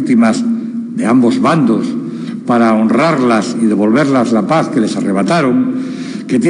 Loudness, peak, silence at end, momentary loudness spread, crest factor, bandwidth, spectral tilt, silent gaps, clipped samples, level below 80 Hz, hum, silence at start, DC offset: -13 LUFS; 0 dBFS; 0 s; 9 LU; 12 dB; 10.5 kHz; -6.5 dB/octave; none; under 0.1%; -64 dBFS; none; 0 s; under 0.1%